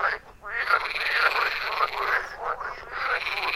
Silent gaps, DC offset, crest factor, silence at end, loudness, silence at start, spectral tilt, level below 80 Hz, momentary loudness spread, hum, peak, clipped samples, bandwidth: none; under 0.1%; 20 dB; 0 s; -26 LUFS; 0 s; -1.5 dB/octave; -54 dBFS; 11 LU; none; -6 dBFS; under 0.1%; 16 kHz